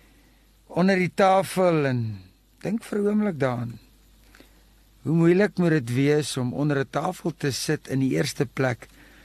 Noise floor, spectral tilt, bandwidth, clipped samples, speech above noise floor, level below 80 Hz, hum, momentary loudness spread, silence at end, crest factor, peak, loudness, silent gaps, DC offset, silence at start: -57 dBFS; -6 dB/octave; 13 kHz; under 0.1%; 34 dB; -58 dBFS; none; 12 LU; 0.4 s; 16 dB; -8 dBFS; -24 LUFS; none; under 0.1%; 0.7 s